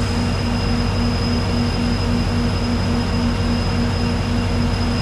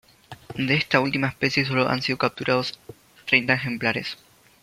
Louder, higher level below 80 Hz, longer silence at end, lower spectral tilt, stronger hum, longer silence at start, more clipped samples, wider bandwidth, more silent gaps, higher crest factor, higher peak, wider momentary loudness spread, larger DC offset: first, -20 LUFS vs -23 LUFS; first, -26 dBFS vs -60 dBFS; second, 0 s vs 0.5 s; about the same, -6 dB/octave vs -5.5 dB/octave; neither; second, 0 s vs 0.3 s; neither; second, 12.5 kHz vs 16 kHz; neither; second, 12 dB vs 24 dB; second, -6 dBFS vs -2 dBFS; second, 1 LU vs 15 LU; neither